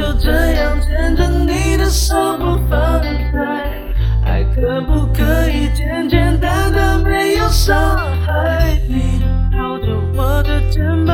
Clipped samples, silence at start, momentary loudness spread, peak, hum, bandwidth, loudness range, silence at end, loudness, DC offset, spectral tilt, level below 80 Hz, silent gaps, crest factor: under 0.1%; 0 s; 4 LU; 0 dBFS; none; 17 kHz; 2 LU; 0 s; -16 LUFS; under 0.1%; -6 dB/octave; -16 dBFS; none; 14 dB